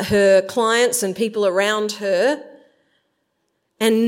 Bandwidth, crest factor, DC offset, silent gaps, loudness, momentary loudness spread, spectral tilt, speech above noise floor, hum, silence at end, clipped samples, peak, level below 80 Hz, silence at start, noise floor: 16.5 kHz; 16 dB; under 0.1%; none; -18 LUFS; 7 LU; -3.5 dB/octave; 54 dB; none; 0 s; under 0.1%; -2 dBFS; -56 dBFS; 0 s; -71 dBFS